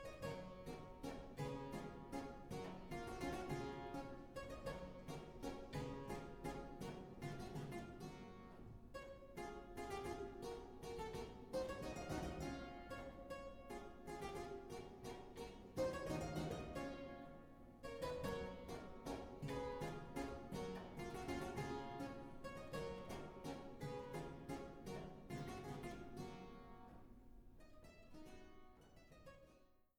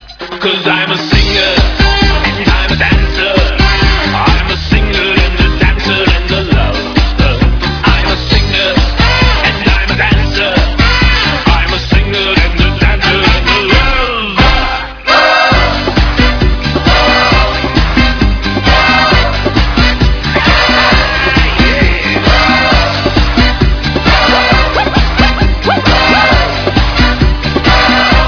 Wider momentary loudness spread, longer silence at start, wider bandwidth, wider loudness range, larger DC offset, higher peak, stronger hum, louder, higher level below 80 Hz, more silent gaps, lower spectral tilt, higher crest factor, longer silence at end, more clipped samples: first, 14 LU vs 5 LU; about the same, 0 s vs 0 s; first, 19.5 kHz vs 5.4 kHz; first, 5 LU vs 2 LU; neither; second, -32 dBFS vs 0 dBFS; neither; second, -51 LUFS vs -9 LUFS; second, -62 dBFS vs -14 dBFS; neither; about the same, -6 dB/octave vs -5.5 dB/octave; first, 20 dB vs 8 dB; first, 0.15 s vs 0 s; second, under 0.1% vs 1%